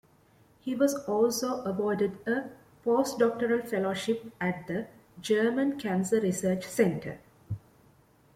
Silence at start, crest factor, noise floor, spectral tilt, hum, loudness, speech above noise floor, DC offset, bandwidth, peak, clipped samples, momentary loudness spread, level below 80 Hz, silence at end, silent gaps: 0.65 s; 18 dB; -62 dBFS; -5.5 dB/octave; none; -29 LUFS; 33 dB; under 0.1%; 16 kHz; -12 dBFS; under 0.1%; 15 LU; -66 dBFS; 0.75 s; none